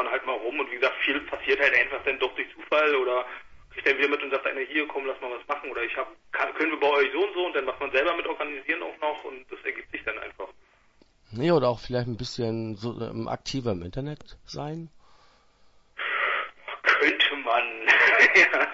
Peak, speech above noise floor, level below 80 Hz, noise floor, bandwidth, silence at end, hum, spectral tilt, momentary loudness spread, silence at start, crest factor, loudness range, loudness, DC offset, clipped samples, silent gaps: -4 dBFS; 35 dB; -58 dBFS; -61 dBFS; 8 kHz; 0 s; none; -4.5 dB/octave; 16 LU; 0 s; 22 dB; 8 LU; -25 LUFS; under 0.1%; under 0.1%; none